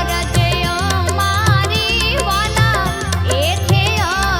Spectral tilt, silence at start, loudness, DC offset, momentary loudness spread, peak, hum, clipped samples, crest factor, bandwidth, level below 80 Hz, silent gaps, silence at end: -4 dB/octave; 0 s; -15 LUFS; under 0.1%; 3 LU; 0 dBFS; none; under 0.1%; 16 dB; 18 kHz; -26 dBFS; none; 0 s